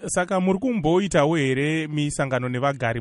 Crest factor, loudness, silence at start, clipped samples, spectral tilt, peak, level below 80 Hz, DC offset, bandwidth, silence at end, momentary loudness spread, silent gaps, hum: 18 dB; -22 LUFS; 0 s; under 0.1%; -5.5 dB/octave; -4 dBFS; -48 dBFS; under 0.1%; 11.5 kHz; 0 s; 5 LU; none; none